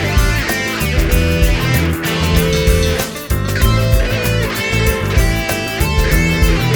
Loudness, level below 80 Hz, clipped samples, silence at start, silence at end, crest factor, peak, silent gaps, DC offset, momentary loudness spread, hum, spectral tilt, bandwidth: -15 LUFS; -18 dBFS; under 0.1%; 0 s; 0 s; 14 dB; 0 dBFS; none; under 0.1%; 3 LU; none; -5 dB/octave; over 20 kHz